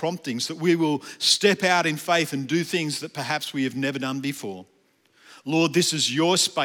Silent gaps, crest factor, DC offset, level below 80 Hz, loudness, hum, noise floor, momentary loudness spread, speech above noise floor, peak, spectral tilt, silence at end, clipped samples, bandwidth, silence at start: none; 20 dB; under 0.1%; -82 dBFS; -23 LUFS; none; -61 dBFS; 10 LU; 38 dB; -6 dBFS; -3.5 dB/octave; 0 s; under 0.1%; 18 kHz; 0 s